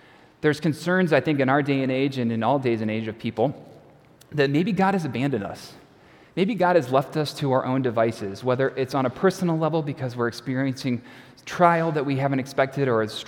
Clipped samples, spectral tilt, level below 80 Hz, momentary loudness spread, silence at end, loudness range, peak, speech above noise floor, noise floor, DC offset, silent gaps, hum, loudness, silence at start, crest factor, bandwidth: under 0.1%; -7 dB/octave; -64 dBFS; 9 LU; 0 s; 3 LU; -2 dBFS; 29 dB; -52 dBFS; under 0.1%; none; none; -23 LUFS; 0.45 s; 20 dB; 17 kHz